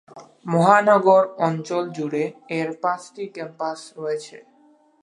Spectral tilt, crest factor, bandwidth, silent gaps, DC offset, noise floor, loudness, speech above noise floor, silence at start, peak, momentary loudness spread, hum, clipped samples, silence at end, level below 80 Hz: -6.5 dB/octave; 20 dB; 11 kHz; none; under 0.1%; -56 dBFS; -21 LUFS; 36 dB; 0.15 s; -2 dBFS; 17 LU; none; under 0.1%; 0.65 s; -78 dBFS